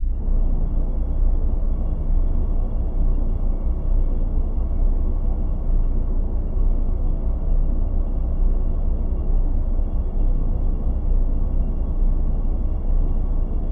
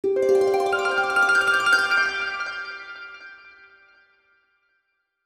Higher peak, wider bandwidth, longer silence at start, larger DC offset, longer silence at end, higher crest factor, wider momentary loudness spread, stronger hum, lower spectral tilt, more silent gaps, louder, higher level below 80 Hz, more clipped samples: about the same, -8 dBFS vs -6 dBFS; second, 1.4 kHz vs 15.5 kHz; about the same, 0 s vs 0.05 s; neither; second, 0 s vs 1.75 s; second, 10 dB vs 18 dB; second, 2 LU vs 20 LU; neither; first, -12 dB/octave vs -2 dB/octave; neither; second, -26 LUFS vs -20 LUFS; first, -18 dBFS vs -66 dBFS; neither